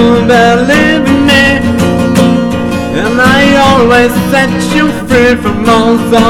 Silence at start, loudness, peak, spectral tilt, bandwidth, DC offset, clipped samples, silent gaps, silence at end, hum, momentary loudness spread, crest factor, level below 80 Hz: 0 s; -7 LUFS; 0 dBFS; -5.5 dB/octave; 17 kHz; 0.7%; under 0.1%; none; 0 s; none; 5 LU; 6 dB; -30 dBFS